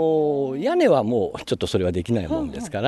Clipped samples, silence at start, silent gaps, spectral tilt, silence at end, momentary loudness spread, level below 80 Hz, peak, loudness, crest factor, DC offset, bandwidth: under 0.1%; 0 s; none; -6.5 dB/octave; 0 s; 9 LU; -46 dBFS; -6 dBFS; -22 LUFS; 16 dB; under 0.1%; 12 kHz